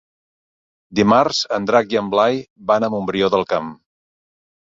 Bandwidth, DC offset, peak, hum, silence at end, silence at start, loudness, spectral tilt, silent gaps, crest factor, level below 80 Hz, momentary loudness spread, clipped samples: 7.8 kHz; under 0.1%; -2 dBFS; none; 0.95 s; 0.9 s; -18 LUFS; -5 dB/octave; 2.50-2.56 s; 18 dB; -56 dBFS; 9 LU; under 0.1%